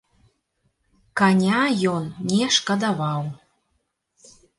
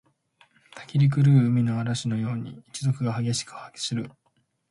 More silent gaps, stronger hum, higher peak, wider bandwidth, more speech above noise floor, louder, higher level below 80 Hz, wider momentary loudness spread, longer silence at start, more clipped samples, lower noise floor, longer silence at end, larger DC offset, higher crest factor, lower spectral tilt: neither; neither; first, -6 dBFS vs -10 dBFS; about the same, 11.5 kHz vs 11.5 kHz; first, 52 dB vs 46 dB; first, -21 LUFS vs -25 LUFS; about the same, -64 dBFS vs -60 dBFS; second, 10 LU vs 17 LU; first, 1.15 s vs 0.75 s; neither; about the same, -73 dBFS vs -70 dBFS; first, 1.25 s vs 0.6 s; neither; about the same, 18 dB vs 16 dB; second, -4.5 dB/octave vs -6 dB/octave